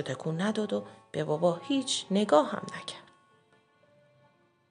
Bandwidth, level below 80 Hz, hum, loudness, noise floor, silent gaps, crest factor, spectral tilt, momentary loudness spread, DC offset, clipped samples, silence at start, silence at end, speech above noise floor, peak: 10.5 kHz; -82 dBFS; none; -30 LUFS; -66 dBFS; none; 24 dB; -5 dB/octave; 15 LU; under 0.1%; under 0.1%; 0 s; 1.7 s; 36 dB; -8 dBFS